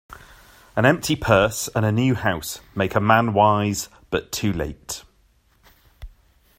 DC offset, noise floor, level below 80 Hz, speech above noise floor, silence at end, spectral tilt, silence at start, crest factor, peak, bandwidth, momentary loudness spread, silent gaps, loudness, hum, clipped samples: under 0.1%; -60 dBFS; -46 dBFS; 39 dB; 0.5 s; -5 dB/octave; 0.1 s; 20 dB; -2 dBFS; 16 kHz; 12 LU; none; -21 LUFS; none; under 0.1%